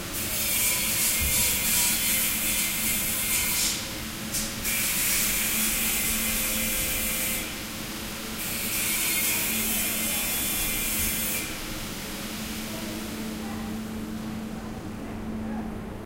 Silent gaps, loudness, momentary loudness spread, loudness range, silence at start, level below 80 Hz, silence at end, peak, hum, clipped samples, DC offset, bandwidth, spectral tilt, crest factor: none; -25 LUFS; 13 LU; 11 LU; 0 s; -42 dBFS; 0 s; -10 dBFS; none; under 0.1%; under 0.1%; 16 kHz; -1.5 dB/octave; 18 dB